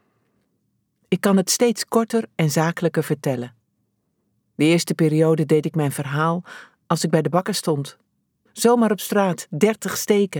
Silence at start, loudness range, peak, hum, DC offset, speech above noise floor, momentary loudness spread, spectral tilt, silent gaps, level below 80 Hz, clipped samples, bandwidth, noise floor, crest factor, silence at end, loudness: 1.1 s; 2 LU; -4 dBFS; none; under 0.1%; 51 dB; 9 LU; -5 dB/octave; none; -70 dBFS; under 0.1%; 20 kHz; -71 dBFS; 18 dB; 0 s; -20 LUFS